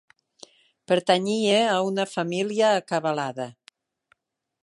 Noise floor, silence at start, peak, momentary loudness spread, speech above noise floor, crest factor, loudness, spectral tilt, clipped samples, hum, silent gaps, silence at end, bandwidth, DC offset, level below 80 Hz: -68 dBFS; 0.9 s; -6 dBFS; 8 LU; 45 dB; 20 dB; -23 LUFS; -4.5 dB/octave; under 0.1%; none; none; 1.15 s; 11.5 kHz; under 0.1%; -76 dBFS